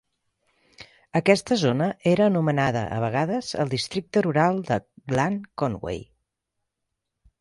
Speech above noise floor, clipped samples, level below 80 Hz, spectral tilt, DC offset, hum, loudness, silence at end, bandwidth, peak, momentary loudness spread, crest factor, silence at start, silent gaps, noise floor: 59 dB; under 0.1%; -56 dBFS; -6 dB/octave; under 0.1%; none; -24 LUFS; 1.35 s; 11.5 kHz; -4 dBFS; 8 LU; 22 dB; 0.8 s; none; -82 dBFS